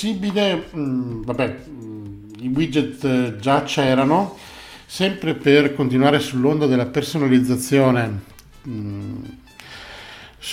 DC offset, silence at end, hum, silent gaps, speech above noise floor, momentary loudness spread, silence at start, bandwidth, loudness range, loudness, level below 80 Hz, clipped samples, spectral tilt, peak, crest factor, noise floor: under 0.1%; 0 s; none; none; 21 dB; 20 LU; 0 s; 16 kHz; 5 LU; -19 LUFS; -50 dBFS; under 0.1%; -6 dB/octave; -2 dBFS; 18 dB; -40 dBFS